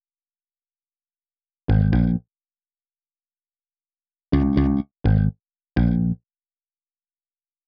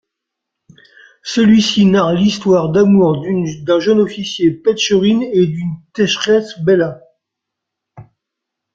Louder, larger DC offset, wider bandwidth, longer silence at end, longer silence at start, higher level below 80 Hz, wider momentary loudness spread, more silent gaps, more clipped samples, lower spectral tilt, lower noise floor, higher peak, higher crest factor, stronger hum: second, -22 LUFS vs -14 LUFS; neither; second, 5.4 kHz vs 7.6 kHz; first, 1.5 s vs 0.75 s; first, 1.7 s vs 1.25 s; first, -32 dBFS vs -52 dBFS; about the same, 9 LU vs 8 LU; neither; neither; first, -9 dB/octave vs -5.5 dB/octave; first, under -90 dBFS vs -79 dBFS; second, -6 dBFS vs -2 dBFS; first, 20 dB vs 14 dB; neither